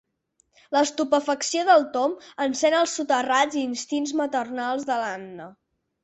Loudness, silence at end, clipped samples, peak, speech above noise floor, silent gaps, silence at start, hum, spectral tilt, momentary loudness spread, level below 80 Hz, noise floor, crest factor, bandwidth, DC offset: -23 LUFS; 0.5 s; under 0.1%; -6 dBFS; 45 dB; none; 0.7 s; none; -2 dB/octave; 9 LU; -72 dBFS; -69 dBFS; 18 dB; 8.4 kHz; under 0.1%